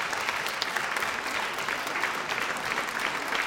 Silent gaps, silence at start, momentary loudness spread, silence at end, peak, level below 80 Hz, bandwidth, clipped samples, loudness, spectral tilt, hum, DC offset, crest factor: none; 0 s; 1 LU; 0 s; -8 dBFS; -62 dBFS; 18 kHz; under 0.1%; -29 LUFS; -1 dB/octave; none; under 0.1%; 22 dB